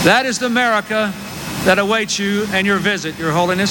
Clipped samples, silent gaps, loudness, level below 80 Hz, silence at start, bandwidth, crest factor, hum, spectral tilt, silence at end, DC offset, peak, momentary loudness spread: under 0.1%; none; -16 LUFS; -48 dBFS; 0 s; 17 kHz; 16 dB; none; -4 dB/octave; 0 s; under 0.1%; 0 dBFS; 5 LU